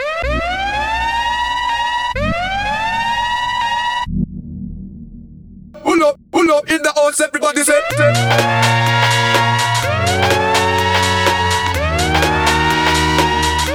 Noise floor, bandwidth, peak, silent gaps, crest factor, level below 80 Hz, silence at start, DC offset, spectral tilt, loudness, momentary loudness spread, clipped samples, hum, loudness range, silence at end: -37 dBFS; 19.5 kHz; 0 dBFS; none; 16 dB; -32 dBFS; 0 s; under 0.1%; -4 dB/octave; -15 LUFS; 6 LU; under 0.1%; none; 6 LU; 0 s